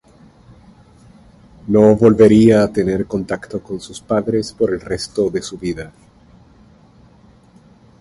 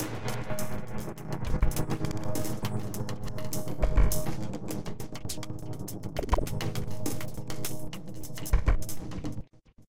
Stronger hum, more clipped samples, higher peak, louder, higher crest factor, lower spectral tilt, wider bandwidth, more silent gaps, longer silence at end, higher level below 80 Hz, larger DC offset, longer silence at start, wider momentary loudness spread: neither; neither; first, 0 dBFS vs -10 dBFS; first, -15 LUFS vs -34 LUFS; about the same, 16 dB vs 18 dB; first, -7 dB/octave vs -5.5 dB/octave; second, 11.5 kHz vs 17 kHz; neither; first, 2.1 s vs 0 s; second, -44 dBFS vs -34 dBFS; second, under 0.1% vs 2%; first, 1.65 s vs 0 s; first, 18 LU vs 10 LU